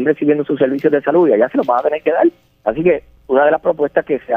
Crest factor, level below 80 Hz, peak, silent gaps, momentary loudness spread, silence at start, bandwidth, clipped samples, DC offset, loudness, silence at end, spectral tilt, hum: 14 dB; -52 dBFS; -2 dBFS; none; 5 LU; 0 s; 4.9 kHz; under 0.1%; under 0.1%; -15 LUFS; 0 s; -9 dB/octave; none